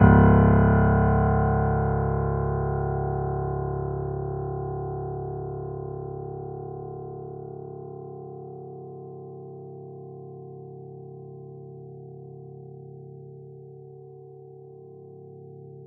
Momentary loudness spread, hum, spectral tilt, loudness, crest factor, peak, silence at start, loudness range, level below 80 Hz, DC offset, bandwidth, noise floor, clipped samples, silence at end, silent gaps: 25 LU; none; -10 dB/octave; -25 LUFS; 22 dB; -4 dBFS; 0 s; 20 LU; -36 dBFS; under 0.1%; 3.2 kHz; -45 dBFS; under 0.1%; 0 s; none